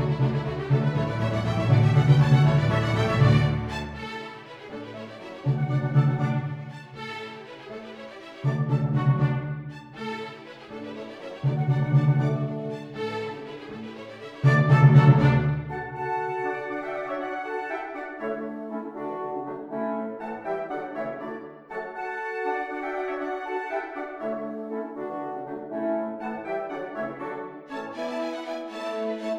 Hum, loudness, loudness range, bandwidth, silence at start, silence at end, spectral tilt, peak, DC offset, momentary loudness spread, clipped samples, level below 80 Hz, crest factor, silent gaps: none; -26 LUFS; 11 LU; 7.4 kHz; 0 s; 0 s; -8.5 dB/octave; -4 dBFS; under 0.1%; 19 LU; under 0.1%; -50 dBFS; 22 dB; none